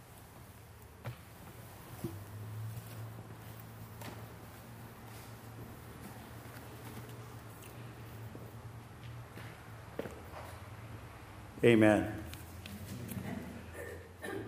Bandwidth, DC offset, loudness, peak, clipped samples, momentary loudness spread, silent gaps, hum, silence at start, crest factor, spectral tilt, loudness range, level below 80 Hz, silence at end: 15.5 kHz; under 0.1%; -39 LUFS; -12 dBFS; under 0.1%; 10 LU; none; none; 0 s; 28 dB; -6.5 dB/octave; 16 LU; -60 dBFS; 0 s